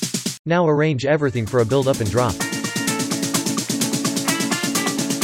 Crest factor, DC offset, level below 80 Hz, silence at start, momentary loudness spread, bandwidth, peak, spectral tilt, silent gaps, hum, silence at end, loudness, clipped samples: 18 dB; under 0.1%; -50 dBFS; 0 s; 4 LU; 17 kHz; -2 dBFS; -4 dB/octave; 0.39-0.45 s; none; 0 s; -20 LUFS; under 0.1%